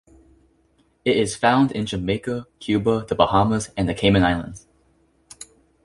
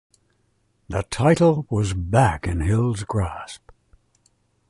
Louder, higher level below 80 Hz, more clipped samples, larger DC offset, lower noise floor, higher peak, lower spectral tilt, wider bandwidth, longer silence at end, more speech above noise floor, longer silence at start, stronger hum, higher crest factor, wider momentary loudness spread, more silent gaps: about the same, -21 LUFS vs -21 LUFS; second, -42 dBFS vs -36 dBFS; neither; neither; second, -62 dBFS vs -66 dBFS; about the same, -2 dBFS vs -4 dBFS; about the same, -5.5 dB/octave vs -6.5 dB/octave; about the same, 11.5 kHz vs 11.5 kHz; second, 0.4 s vs 1.15 s; second, 42 dB vs 46 dB; first, 1.05 s vs 0.9 s; neither; about the same, 20 dB vs 18 dB; first, 19 LU vs 13 LU; neither